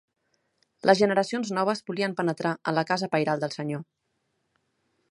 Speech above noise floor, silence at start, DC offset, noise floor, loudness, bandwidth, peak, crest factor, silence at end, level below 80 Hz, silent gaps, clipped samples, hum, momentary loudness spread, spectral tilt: 50 dB; 0.85 s; under 0.1%; -76 dBFS; -26 LUFS; 11.5 kHz; -4 dBFS; 24 dB; 1.3 s; -74 dBFS; none; under 0.1%; none; 9 LU; -5.5 dB/octave